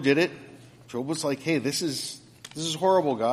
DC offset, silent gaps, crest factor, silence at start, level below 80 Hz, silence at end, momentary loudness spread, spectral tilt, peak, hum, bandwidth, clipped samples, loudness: under 0.1%; none; 20 dB; 0 s; -68 dBFS; 0 s; 16 LU; -4 dB/octave; -8 dBFS; none; 15.5 kHz; under 0.1%; -27 LUFS